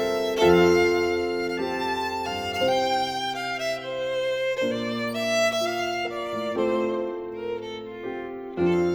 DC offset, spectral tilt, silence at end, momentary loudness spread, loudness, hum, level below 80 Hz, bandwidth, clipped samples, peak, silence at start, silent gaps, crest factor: under 0.1%; -4.5 dB/octave; 0 s; 13 LU; -25 LUFS; none; -54 dBFS; over 20 kHz; under 0.1%; -6 dBFS; 0 s; none; 18 dB